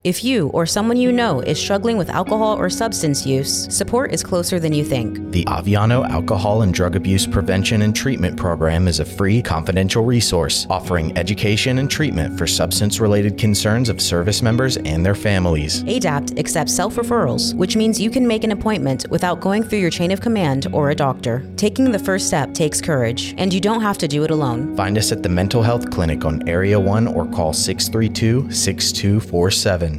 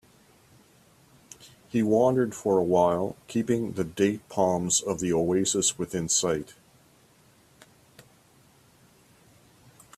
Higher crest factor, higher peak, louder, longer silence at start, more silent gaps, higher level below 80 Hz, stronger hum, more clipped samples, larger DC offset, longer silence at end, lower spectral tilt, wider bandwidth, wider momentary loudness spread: second, 12 dB vs 20 dB; about the same, -6 dBFS vs -8 dBFS; first, -18 LUFS vs -25 LUFS; second, 0.05 s vs 1.4 s; neither; first, -38 dBFS vs -62 dBFS; neither; neither; neither; second, 0 s vs 3.45 s; about the same, -5 dB/octave vs -4 dB/octave; first, 16 kHz vs 14.5 kHz; second, 4 LU vs 9 LU